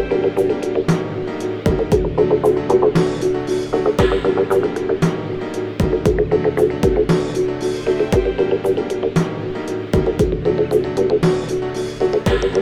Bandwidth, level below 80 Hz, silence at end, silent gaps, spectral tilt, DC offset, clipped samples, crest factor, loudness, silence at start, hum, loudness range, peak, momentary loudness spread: 14.5 kHz; -32 dBFS; 0 s; none; -7 dB/octave; 0.3%; under 0.1%; 16 dB; -18 LUFS; 0 s; none; 2 LU; -2 dBFS; 7 LU